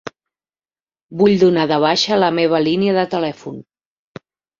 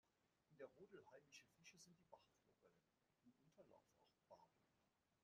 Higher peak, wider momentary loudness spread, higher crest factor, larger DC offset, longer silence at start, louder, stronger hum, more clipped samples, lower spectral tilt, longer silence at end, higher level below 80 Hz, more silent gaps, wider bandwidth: first, -2 dBFS vs -48 dBFS; first, 19 LU vs 5 LU; second, 16 dB vs 24 dB; neither; about the same, 0.05 s vs 0.05 s; first, -15 LUFS vs -67 LUFS; neither; neither; first, -5.5 dB/octave vs -3.5 dB/octave; first, 1 s vs 0 s; first, -58 dBFS vs under -90 dBFS; first, 0.82-0.87 s, 1.02-1.09 s vs none; second, 7.6 kHz vs 8.8 kHz